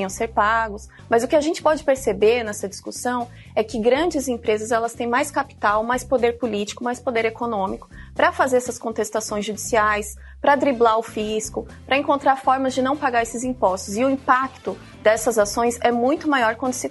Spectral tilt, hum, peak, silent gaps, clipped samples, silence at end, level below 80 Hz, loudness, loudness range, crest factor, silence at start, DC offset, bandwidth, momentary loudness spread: -3.5 dB/octave; none; -2 dBFS; none; under 0.1%; 0 s; -46 dBFS; -21 LUFS; 2 LU; 20 dB; 0 s; under 0.1%; 12 kHz; 9 LU